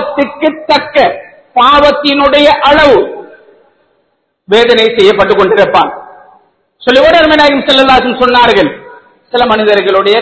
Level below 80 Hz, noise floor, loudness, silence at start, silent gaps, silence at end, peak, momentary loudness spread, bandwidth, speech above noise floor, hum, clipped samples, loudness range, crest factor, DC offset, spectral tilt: -38 dBFS; -59 dBFS; -7 LUFS; 0 s; none; 0 s; 0 dBFS; 10 LU; 8 kHz; 53 dB; none; 2%; 2 LU; 8 dB; under 0.1%; -4.5 dB/octave